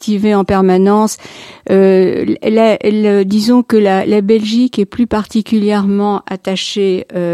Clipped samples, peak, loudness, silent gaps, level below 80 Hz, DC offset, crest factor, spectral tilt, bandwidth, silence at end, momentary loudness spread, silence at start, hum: under 0.1%; 0 dBFS; -12 LUFS; none; -44 dBFS; under 0.1%; 12 dB; -6 dB/octave; 13.5 kHz; 0 s; 7 LU; 0 s; none